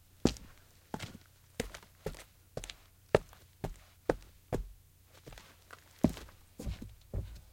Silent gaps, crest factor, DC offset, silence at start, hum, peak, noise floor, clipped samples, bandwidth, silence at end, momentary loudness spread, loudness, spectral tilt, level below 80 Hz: none; 32 dB; under 0.1%; 0.25 s; none; -8 dBFS; -61 dBFS; under 0.1%; 16.5 kHz; 0.1 s; 22 LU; -39 LUFS; -6 dB/octave; -50 dBFS